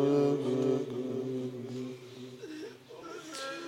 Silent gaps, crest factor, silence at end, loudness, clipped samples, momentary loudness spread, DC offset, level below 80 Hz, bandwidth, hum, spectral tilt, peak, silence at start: none; 16 dB; 0 s; -34 LUFS; under 0.1%; 17 LU; under 0.1%; -78 dBFS; 16 kHz; none; -6.5 dB/octave; -16 dBFS; 0 s